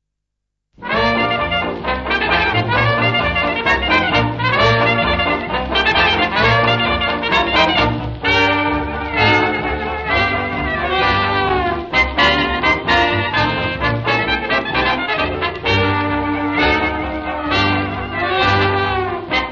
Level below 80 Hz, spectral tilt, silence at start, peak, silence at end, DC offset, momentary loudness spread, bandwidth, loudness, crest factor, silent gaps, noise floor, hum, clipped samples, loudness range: -32 dBFS; -6 dB/octave; 0.8 s; -2 dBFS; 0 s; 0.2%; 6 LU; 7.6 kHz; -16 LUFS; 14 dB; none; -77 dBFS; none; under 0.1%; 3 LU